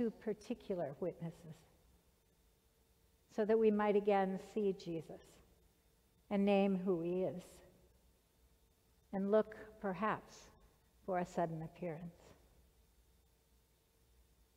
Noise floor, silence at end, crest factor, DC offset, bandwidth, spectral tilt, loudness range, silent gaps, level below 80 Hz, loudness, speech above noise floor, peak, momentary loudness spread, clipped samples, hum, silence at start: -73 dBFS; 2.45 s; 20 dB; under 0.1%; 15.5 kHz; -7.5 dB/octave; 8 LU; none; -72 dBFS; -38 LUFS; 36 dB; -22 dBFS; 18 LU; under 0.1%; none; 0 s